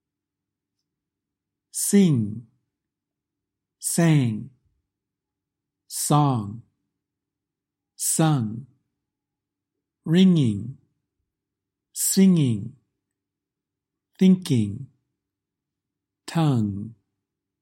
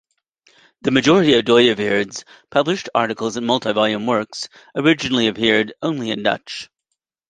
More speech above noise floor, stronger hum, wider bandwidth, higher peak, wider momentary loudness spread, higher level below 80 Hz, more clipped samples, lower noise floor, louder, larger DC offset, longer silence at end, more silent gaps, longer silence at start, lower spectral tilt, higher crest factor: first, 66 dB vs 59 dB; neither; first, 16.5 kHz vs 9.6 kHz; second, -6 dBFS vs -2 dBFS; first, 20 LU vs 14 LU; second, -68 dBFS vs -56 dBFS; neither; first, -86 dBFS vs -77 dBFS; second, -22 LUFS vs -18 LUFS; neither; about the same, 0.7 s vs 0.65 s; neither; first, 1.75 s vs 0.85 s; about the same, -5.5 dB/octave vs -4.5 dB/octave; about the same, 20 dB vs 18 dB